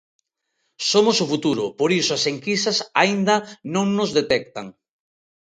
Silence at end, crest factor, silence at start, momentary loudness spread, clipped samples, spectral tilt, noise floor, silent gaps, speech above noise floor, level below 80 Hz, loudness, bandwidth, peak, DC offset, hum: 0.7 s; 20 dB; 0.8 s; 8 LU; under 0.1%; -3.5 dB/octave; -74 dBFS; none; 54 dB; -64 dBFS; -20 LUFS; 9.4 kHz; 0 dBFS; under 0.1%; none